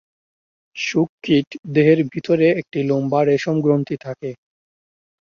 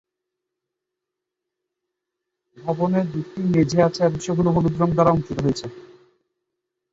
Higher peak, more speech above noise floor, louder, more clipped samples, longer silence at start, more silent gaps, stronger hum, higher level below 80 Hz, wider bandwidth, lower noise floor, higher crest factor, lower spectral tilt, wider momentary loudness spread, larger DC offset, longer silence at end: about the same, -2 dBFS vs -4 dBFS; first, over 72 dB vs 64 dB; about the same, -19 LUFS vs -21 LUFS; neither; second, 0.75 s vs 2.6 s; first, 1.09-1.18 s, 1.47-1.51 s, 1.59-1.63 s vs none; neither; second, -62 dBFS vs -50 dBFS; about the same, 7.2 kHz vs 7.8 kHz; first, under -90 dBFS vs -84 dBFS; about the same, 16 dB vs 20 dB; about the same, -7 dB/octave vs -7.5 dB/octave; about the same, 12 LU vs 10 LU; neither; second, 0.85 s vs 1.1 s